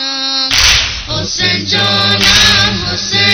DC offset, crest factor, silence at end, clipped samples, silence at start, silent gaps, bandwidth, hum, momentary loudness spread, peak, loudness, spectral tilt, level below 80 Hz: under 0.1%; 12 dB; 0 s; 0.5%; 0 s; none; over 20 kHz; none; 9 LU; 0 dBFS; -9 LUFS; -2 dB/octave; -28 dBFS